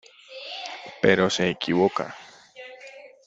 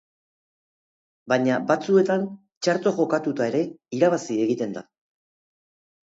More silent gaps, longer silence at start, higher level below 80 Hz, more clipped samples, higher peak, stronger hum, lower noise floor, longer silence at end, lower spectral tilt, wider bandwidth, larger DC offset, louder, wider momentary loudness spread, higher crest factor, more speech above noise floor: second, none vs 2.57-2.61 s; second, 0.3 s vs 1.25 s; first, -62 dBFS vs -74 dBFS; neither; about the same, -4 dBFS vs -6 dBFS; neither; second, -46 dBFS vs under -90 dBFS; second, 0.2 s vs 1.3 s; second, -4.5 dB/octave vs -6 dB/octave; about the same, 8 kHz vs 8 kHz; neither; about the same, -24 LUFS vs -23 LUFS; first, 23 LU vs 9 LU; about the same, 22 dB vs 20 dB; second, 23 dB vs over 68 dB